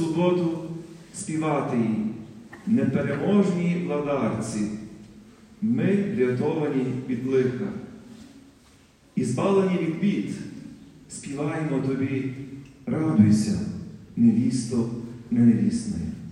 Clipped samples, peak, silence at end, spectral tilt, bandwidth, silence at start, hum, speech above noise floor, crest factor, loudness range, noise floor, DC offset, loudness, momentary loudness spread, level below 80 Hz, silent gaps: under 0.1%; -6 dBFS; 0 s; -7 dB/octave; 11 kHz; 0 s; none; 32 dB; 20 dB; 5 LU; -55 dBFS; under 0.1%; -25 LUFS; 18 LU; -58 dBFS; none